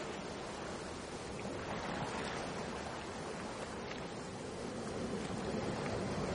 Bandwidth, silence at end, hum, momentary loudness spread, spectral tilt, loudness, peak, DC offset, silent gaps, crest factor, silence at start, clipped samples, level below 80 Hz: 10.5 kHz; 0 s; none; 5 LU; -5 dB/octave; -42 LUFS; -26 dBFS; under 0.1%; none; 16 dB; 0 s; under 0.1%; -58 dBFS